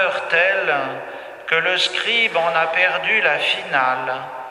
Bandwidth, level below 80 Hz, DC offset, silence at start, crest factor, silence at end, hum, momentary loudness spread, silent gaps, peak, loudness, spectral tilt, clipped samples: 13 kHz; -70 dBFS; under 0.1%; 0 s; 18 dB; 0 s; none; 11 LU; none; -2 dBFS; -18 LUFS; -2 dB/octave; under 0.1%